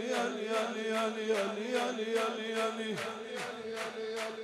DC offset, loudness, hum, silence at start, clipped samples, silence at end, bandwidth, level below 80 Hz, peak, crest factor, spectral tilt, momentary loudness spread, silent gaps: under 0.1%; -35 LUFS; none; 0 s; under 0.1%; 0 s; 14.5 kHz; -88 dBFS; -20 dBFS; 16 dB; -3.5 dB/octave; 6 LU; none